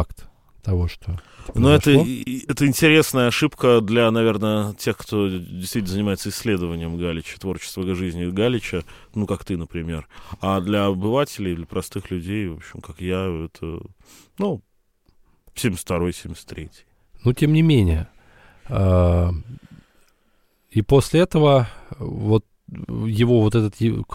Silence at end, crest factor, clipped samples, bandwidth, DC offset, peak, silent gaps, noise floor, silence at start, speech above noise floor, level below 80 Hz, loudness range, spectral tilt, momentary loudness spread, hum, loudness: 0 s; 20 dB; under 0.1%; 16.5 kHz; under 0.1%; 0 dBFS; none; -62 dBFS; 0 s; 42 dB; -38 dBFS; 11 LU; -6 dB/octave; 17 LU; none; -21 LUFS